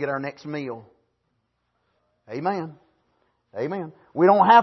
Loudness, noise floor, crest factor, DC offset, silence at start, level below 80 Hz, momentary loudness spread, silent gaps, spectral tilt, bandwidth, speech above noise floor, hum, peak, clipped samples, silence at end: -23 LUFS; -73 dBFS; 20 dB; under 0.1%; 0 s; -74 dBFS; 20 LU; none; -7.5 dB/octave; 6.2 kHz; 52 dB; none; -4 dBFS; under 0.1%; 0 s